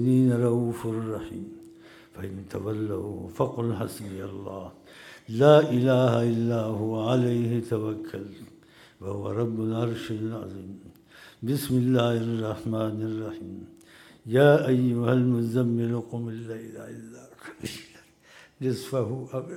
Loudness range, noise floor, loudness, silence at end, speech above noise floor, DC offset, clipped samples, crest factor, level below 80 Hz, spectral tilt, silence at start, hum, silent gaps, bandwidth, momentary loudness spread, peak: 10 LU; -54 dBFS; -26 LUFS; 0 s; 29 dB; under 0.1%; under 0.1%; 22 dB; -64 dBFS; -7.5 dB/octave; 0 s; none; none; 16 kHz; 20 LU; -4 dBFS